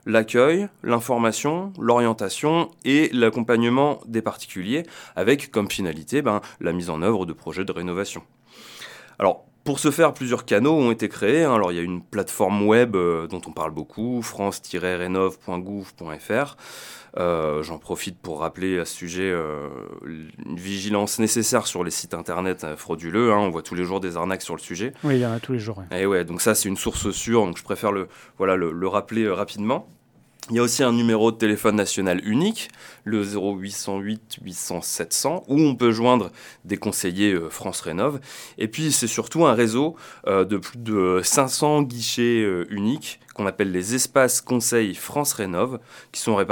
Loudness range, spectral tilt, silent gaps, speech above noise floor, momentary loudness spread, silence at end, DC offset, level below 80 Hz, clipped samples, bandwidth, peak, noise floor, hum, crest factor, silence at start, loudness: 6 LU; -4.5 dB/octave; none; 20 dB; 12 LU; 0 s; under 0.1%; -56 dBFS; under 0.1%; 19 kHz; -2 dBFS; -42 dBFS; none; 20 dB; 0.05 s; -23 LUFS